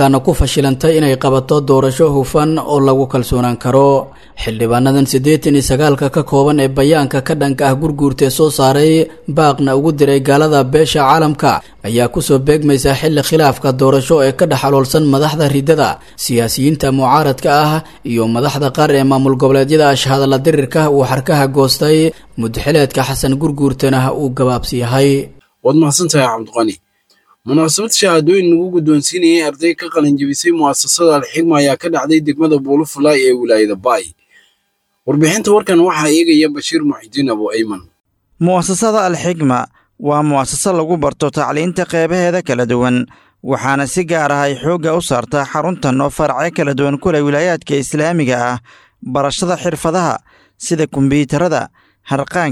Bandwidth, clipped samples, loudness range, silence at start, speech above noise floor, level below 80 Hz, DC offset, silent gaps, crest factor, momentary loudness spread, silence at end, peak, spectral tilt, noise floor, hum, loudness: 15 kHz; under 0.1%; 4 LU; 0 s; 53 dB; -36 dBFS; under 0.1%; none; 12 dB; 7 LU; 0 s; 0 dBFS; -5 dB/octave; -65 dBFS; none; -13 LUFS